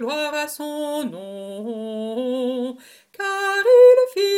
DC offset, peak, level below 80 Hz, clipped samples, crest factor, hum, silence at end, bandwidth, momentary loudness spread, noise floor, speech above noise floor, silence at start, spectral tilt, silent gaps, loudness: under 0.1%; -4 dBFS; -78 dBFS; under 0.1%; 16 dB; none; 0 s; 16 kHz; 19 LU; -41 dBFS; 14 dB; 0 s; -3 dB/octave; none; -19 LUFS